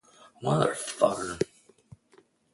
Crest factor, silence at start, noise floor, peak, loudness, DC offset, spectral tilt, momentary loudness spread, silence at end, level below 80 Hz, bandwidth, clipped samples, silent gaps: 22 dB; 0.4 s; -62 dBFS; -8 dBFS; -28 LUFS; under 0.1%; -5 dB/octave; 8 LU; 1.1 s; -62 dBFS; 11.5 kHz; under 0.1%; none